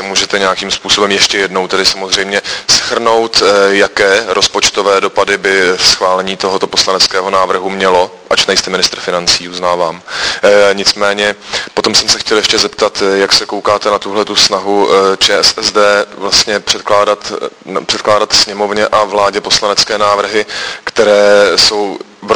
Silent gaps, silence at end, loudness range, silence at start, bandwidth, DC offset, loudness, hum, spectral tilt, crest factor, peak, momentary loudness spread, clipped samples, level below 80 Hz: none; 0 s; 2 LU; 0 s; 11 kHz; 0.2%; -10 LUFS; none; -1.5 dB/octave; 10 dB; 0 dBFS; 7 LU; 0.4%; -44 dBFS